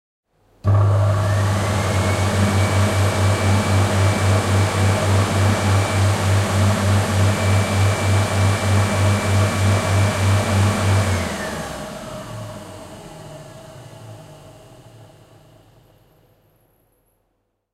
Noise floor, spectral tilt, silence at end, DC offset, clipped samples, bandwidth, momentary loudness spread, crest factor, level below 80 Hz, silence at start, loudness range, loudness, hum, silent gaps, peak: -70 dBFS; -5.5 dB/octave; 2.7 s; under 0.1%; under 0.1%; 13.5 kHz; 19 LU; 14 dB; -44 dBFS; 0.65 s; 14 LU; -18 LUFS; none; none; -4 dBFS